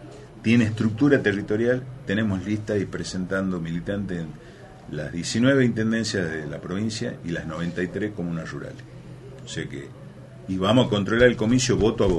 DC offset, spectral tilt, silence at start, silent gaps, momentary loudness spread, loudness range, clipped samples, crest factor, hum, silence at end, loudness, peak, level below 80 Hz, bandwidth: under 0.1%; -5.5 dB/octave; 0 s; none; 21 LU; 7 LU; under 0.1%; 22 dB; none; 0 s; -24 LUFS; -2 dBFS; -46 dBFS; 11.5 kHz